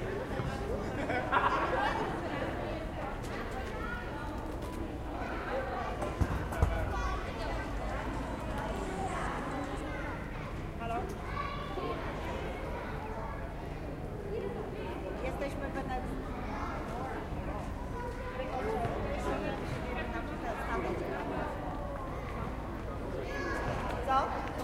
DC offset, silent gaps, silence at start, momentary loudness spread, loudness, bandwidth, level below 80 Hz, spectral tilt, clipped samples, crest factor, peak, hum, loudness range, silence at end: under 0.1%; none; 0 s; 7 LU; -37 LUFS; 16 kHz; -42 dBFS; -6.5 dB/octave; under 0.1%; 22 dB; -14 dBFS; none; 5 LU; 0 s